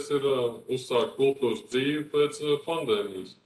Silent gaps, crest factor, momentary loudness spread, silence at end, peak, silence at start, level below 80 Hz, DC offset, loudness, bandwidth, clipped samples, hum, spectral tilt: none; 16 dB; 4 LU; 0.15 s; -12 dBFS; 0 s; -72 dBFS; under 0.1%; -28 LUFS; 12.5 kHz; under 0.1%; none; -5 dB/octave